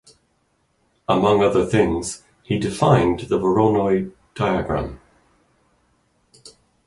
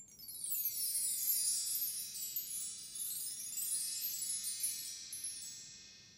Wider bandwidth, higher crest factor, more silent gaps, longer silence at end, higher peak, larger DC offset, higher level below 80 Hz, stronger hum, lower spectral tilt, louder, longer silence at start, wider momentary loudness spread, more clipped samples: second, 11.5 kHz vs 16 kHz; about the same, 20 dB vs 20 dB; neither; first, 0.4 s vs 0 s; first, -2 dBFS vs -22 dBFS; neither; first, -44 dBFS vs -80 dBFS; neither; first, -6.5 dB/octave vs 2.5 dB/octave; first, -20 LUFS vs -37 LUFS; first, 1.1 s vs 0 s; first, 14 LU vs 11 LU; neither